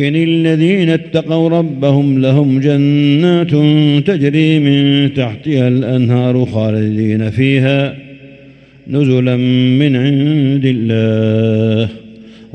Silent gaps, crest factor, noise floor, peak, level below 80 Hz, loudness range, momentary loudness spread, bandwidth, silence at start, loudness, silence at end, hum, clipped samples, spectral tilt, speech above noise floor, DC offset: none; 10 dB; -40 dBFS; 0 dBFS; -52 dBFS; 3 LU; 5 LU; 8.6 kHz; 0 s; -12 LUFS; 0.1 s; none; under 0.1%; -8.5 dB/octave; 29 dB; under 0.1%